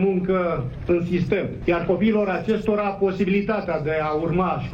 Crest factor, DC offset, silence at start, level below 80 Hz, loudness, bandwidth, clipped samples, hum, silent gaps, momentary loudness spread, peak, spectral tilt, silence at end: 12 dB; under 0.1%; 0 s; -42 dBFS; -22 LUFS; 7.4 kHz; under 0.1%; none; none; 4 LU; -8 dBFS; -8.5 dB/octave; 0 s